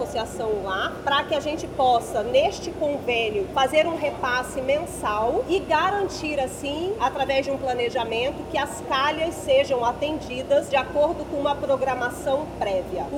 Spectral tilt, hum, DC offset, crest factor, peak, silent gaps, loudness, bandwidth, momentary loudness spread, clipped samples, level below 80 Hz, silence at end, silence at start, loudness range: -4 dB/octave; none; under 0.1%; 16 dB; -6 dBFS; none; -24 LUFS; 16.5 kHz; 6 LU; under 0.1%; -46 dBFS; 0 s; 0 s; 2 LU